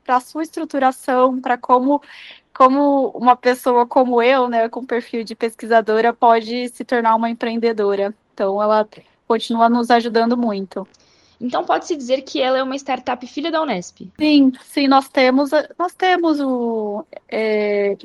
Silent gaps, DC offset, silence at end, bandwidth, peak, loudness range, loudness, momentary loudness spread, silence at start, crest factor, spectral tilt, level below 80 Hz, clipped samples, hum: none; under 0.1%; 0.1 s; 12.5 kHz; 0 dBFS; 4 LU; -18 LUFS; 11 LU; 0.1 s; 18 dB; -4.5 dB/octave; -66 dBFS; under 0.1%; none